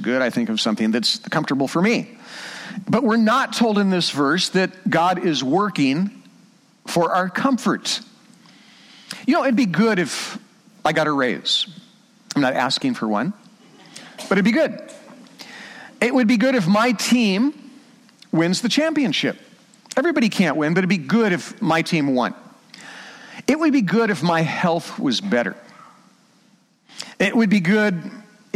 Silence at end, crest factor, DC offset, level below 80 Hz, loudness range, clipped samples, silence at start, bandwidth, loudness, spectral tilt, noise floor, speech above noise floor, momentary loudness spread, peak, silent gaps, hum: 0.35 s; 16 dB; under 0.1%; -66 dBFS; 4 LU; under 0.1%; 0 s; 15 kHz; -20 LUFS; -5 dB/octave; -58 dBFS; 38 dB; 19 LU; -6 dBFS; none; none